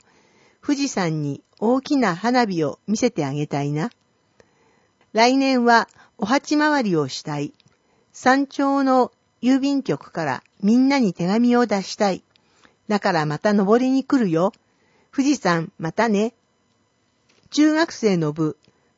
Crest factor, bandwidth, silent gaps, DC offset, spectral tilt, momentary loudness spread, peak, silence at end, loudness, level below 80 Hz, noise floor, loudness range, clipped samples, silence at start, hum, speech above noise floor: 20 dB; 8 kHz; none; under 0.1%; -5.5 dB/octave; 9 LU; -2 dBFS; 0.45 s; -21 LUFS; -68 dBFS; -65 dBFS; 3 LU; under 0.1%; 0.65 s; none; 46 dB